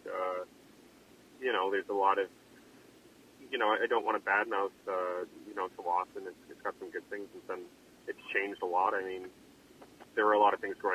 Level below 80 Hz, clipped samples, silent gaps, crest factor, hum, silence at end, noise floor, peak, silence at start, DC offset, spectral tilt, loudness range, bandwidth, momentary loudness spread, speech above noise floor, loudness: -78 dBFS; under 0.1%; none; 20 dB; none; 0 s; -59 dBFS; -14 dBFS; 0.05 s; under 0.1%; -4 dB/octave; 6 LU; 15.5 kHz; 15 LU; 26 dB; -33 LUFS